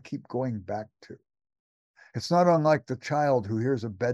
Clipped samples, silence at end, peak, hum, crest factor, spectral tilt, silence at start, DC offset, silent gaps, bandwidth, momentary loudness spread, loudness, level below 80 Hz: under 0.1%; 0 s; -10 dBFS; none; 18 dB; -7 dB/octave; 0.05 s; under 0.1%; 1.59-1.94 s; 12 kHz; 15 LU; -27 LUFS; -68 dBFS